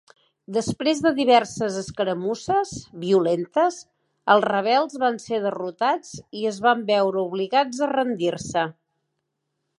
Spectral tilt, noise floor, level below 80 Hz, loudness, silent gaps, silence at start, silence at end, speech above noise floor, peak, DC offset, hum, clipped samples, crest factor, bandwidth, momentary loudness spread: -4.5 dB/octave; -78 dBFS; -60 dBFS; -23 LUFS; none; 0.5 s; 1.05 s; 55 dB; -4 dBFS; under 0.1%; none; under 0.1%; 20 dB; 11.5 kHz; 10 LU